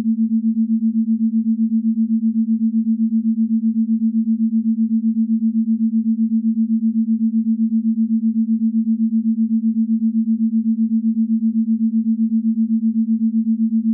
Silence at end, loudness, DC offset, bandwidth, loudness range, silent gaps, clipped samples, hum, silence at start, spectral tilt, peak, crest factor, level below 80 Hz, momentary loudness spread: 0 s; -18 LUFS; under 0.1%; 0.4 kHz; 0 LU; none; under 0.1%; none; 0 s; -24 dB/octave; -12 dBFS; 6 dB; under -90 dBFS; 0 LU